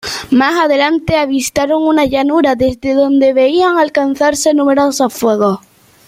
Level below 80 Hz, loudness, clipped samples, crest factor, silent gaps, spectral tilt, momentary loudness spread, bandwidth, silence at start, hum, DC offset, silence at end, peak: -44 dBFS; -12 LUFS; under 0.1%; 12 dB; none; -4 dB/octave; 4 LU; 16 kHz; 0.05 s; none; under 0.1%; 0.5 s; 0 dBFS